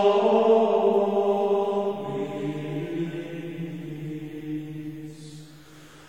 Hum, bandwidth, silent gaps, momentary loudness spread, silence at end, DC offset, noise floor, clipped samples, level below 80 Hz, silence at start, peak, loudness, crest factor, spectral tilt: none; 10 kHz; none; 18 LU; 0 s; 0.2%; -48 dBFS; under 0.1%; -64 dBFS; 0 s; -8 dBFS; -25 LUFS; 16 dB; -7.5 dB/octave